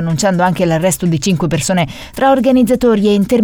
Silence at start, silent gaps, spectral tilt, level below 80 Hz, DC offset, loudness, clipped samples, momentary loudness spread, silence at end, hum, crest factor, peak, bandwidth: 0 s; none; -5.5 dB/octave; -38 dBFS; under 0.1%; -13 LUFS; under 0.1%; 5 LU; 0 s; none; 10 dB; -2 dBFS; 18 kHz